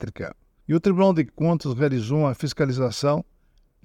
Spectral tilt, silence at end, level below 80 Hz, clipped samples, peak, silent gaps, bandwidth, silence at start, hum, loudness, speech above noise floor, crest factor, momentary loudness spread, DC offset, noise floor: -7 dB/octave; 0.6 s; -52 dBFS; under 0.1%; -6 dBFS; none; 13 kHz; 0 s; none; -23 LUFS; 38 dB; 18 dB; 14 LU; under 0.1%; -60 dBFS